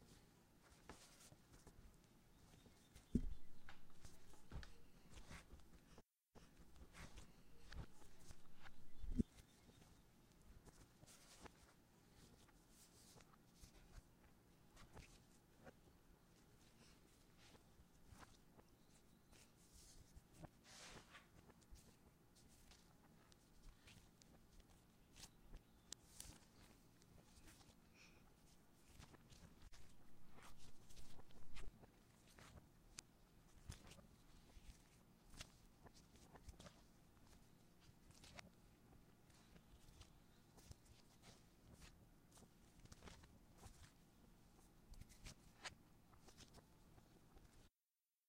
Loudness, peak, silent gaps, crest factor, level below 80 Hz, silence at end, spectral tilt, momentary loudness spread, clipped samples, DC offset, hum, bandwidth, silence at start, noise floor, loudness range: -62 LUFS; -26 dBFS; none; 32 dB; -66 dBFS; 0.6 s; -4.5 dB/octave; 9 LU; under 0.1%; under 0.1%; none; 16 kHz; 0 s; under -90 dBFS; 12 LU